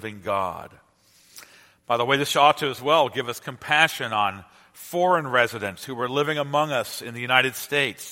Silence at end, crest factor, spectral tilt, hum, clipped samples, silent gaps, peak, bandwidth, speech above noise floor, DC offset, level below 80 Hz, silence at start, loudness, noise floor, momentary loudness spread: 0 s; 24 dB; -3.5 dB/octave; none; under 0.1%; none; 0 dBFS; 16.5 kHz; 34 dB; under 0.1%; -66 dBFS; 0 s; -23 LUFS; -58 dBFS; 12 LU